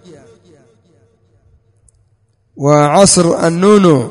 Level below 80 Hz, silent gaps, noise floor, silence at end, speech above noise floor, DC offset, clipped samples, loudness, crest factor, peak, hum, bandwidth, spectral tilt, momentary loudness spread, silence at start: -46 dBFS; none; -57 dBFS; 0 s; 47 dB; under 0.1%; 0.3%; -9 LUFS; 14 dB; 0 dBFS; none; 11 kHz; -5 dB/octave; 5 LU; 2.55 s